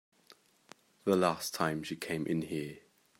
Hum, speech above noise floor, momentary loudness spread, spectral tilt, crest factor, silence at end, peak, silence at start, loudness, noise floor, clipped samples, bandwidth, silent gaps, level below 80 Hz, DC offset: none; 31 dB; 10 LU; -5 dB/octave; 22 dB; 0.4 s; -14 dBFS; 0.3 s; -34 LUFS; -63 dBFS; under 0.1%; 16 kHz; none; -72 dBFS; under 0.1%